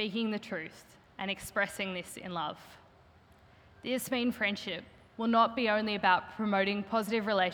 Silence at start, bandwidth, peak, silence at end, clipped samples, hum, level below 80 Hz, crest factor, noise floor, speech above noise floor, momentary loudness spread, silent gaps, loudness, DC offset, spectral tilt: 0 s; over 20 kHz; -12 dBFS; 0 s; under 0.1%; none; -68 dBFS; 20 dB; -60 dBFS; 28 dB; 13 LU; none; -32 LUFS; under 0.1%; -4.5 dB/octave